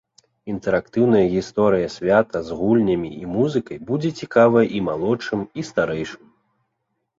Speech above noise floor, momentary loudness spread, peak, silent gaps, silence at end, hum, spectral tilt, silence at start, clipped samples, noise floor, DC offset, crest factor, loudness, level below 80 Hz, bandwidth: 55 dB; 10 LU; -2 dBFS; none; 1.05 s; none; -7 dB/octave; 0.45 s; under 0.1%; -75 dBFS; under 0.1%; 18 dB; -20 LUFS; -52 dBFS; 7.8 kHz